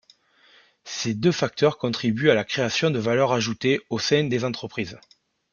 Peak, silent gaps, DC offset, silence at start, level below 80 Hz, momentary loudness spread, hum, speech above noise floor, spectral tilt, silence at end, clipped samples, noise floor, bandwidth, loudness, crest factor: -4 dBFS; none; under 0.1%; 0.85 s; -62 dBFS; 9 LU; none; 35 dB; -5 dB/octave; 0.55 s; under 0.1%; -58 dBFS; 7.2 kHz; -23 LUFS; 20 dB